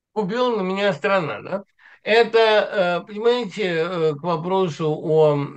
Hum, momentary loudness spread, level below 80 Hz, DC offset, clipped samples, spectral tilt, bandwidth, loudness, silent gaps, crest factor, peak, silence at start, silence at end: none; 9 LU; -72 dBFS; under 0.1%; under 0.1%; -6 dB/octave; 8.6 kHz; -20 LUFS; none; 18 dB; -2 dBFS; 0.15 s; 0 s